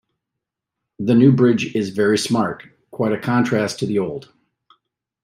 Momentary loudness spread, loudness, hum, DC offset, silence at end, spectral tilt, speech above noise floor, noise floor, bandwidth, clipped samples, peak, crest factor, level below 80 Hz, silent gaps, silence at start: 14 LU; -18 LUFS; none; under 0.1%; 1.05 s; -6.5 dB/octave; 65 dB; -82 dBFS; 15.5 kHz; under 0.1%; -2 dBFS; 18 dB; -62 dBFS; none; 1 s